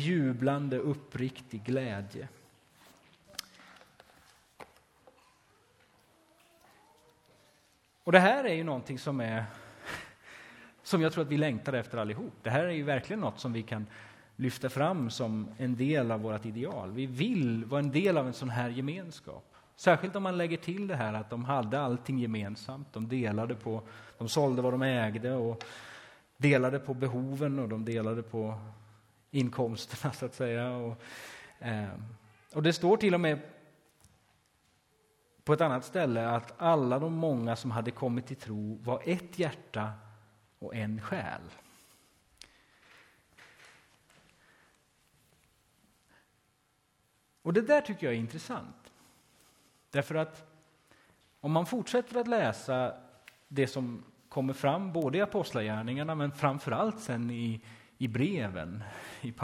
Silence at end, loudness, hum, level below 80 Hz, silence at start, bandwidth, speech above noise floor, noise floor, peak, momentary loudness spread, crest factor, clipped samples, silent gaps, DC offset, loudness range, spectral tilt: 0 s; -32 LUFS; none; -68 dBFS; 0 s; 16 kHz; 41 dB; -73 dBFS; -4 dBFS; 15 LU; 30 dB; under 0.1%; none; under 0.1%; 9 LU; -6.5 dB/octave